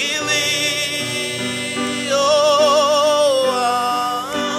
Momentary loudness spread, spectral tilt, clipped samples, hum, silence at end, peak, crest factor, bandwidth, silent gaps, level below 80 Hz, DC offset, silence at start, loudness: 8 LU; -2 dB/octave; under 0.1%; none; 0 s; -4 dBFS; 14 dB; 16 kHz; none; -60 dBFS; under 0.1%; 0 s; -17 LUFS